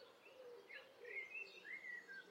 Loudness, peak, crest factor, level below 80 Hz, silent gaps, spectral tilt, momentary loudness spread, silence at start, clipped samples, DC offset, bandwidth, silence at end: -53 LUFS; -40 dBFS; 16 dB; under -90 dBFS; none; -2 dB/octave; 11 LU; 0 s; under 0.1%; under 0.1%; 16 kHz; 0 s